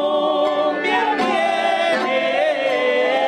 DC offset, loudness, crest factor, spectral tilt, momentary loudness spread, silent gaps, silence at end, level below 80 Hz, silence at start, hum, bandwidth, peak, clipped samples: under 0.1%; -18 LUFS; 10 dB; -3.5 dB/octave; 1 LU; none; 0 s; -68 dBFS; 0 s; none; 10 kHz; -8 dBFS; under 0.1%